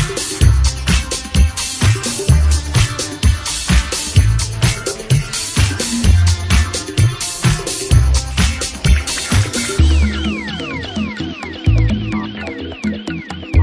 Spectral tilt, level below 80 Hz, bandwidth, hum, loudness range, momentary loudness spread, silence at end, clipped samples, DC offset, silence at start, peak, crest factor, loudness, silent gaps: -4.5 dB/octave; -18 dBFS; 11 kHz; none; 3 LU; 9 LU; 0 s; under 0.1%; under 0.1%; 0 s; 0 dBFS; 14 dB; -16 LUFS; none